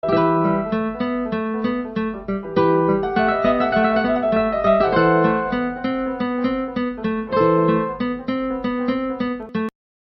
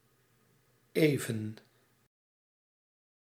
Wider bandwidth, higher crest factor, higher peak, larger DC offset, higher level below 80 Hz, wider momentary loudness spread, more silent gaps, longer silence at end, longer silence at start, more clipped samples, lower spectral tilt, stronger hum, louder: second, 6 kHz vs 16.5 kHz; second, 14 dB vs 26 dB; first, -6 dBFS vs -12 dBFS; neither; first, -46 dBFS vs -80 dBFS; second, 8 LU vs 16 LU; neither; second, 0.35 s vs 1.75 s; second, 0.05 s vs 0.95 s; neither; first, -9.5 dB/octave vs -6 dB/octave; neither; first, -20 LUFS vs -32 LUFS